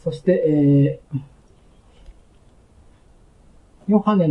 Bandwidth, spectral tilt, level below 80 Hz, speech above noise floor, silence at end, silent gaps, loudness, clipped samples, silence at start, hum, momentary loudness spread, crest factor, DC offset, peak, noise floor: 5.8 kHz; -10 dB/octave; -52 dBFS; 34 dB; 0 s; none; -19 LUFS; under 0.1%; 0.05 s; none; 16 LU; 18 dB; under 0.1%; -4 dBFS; -52 dBFS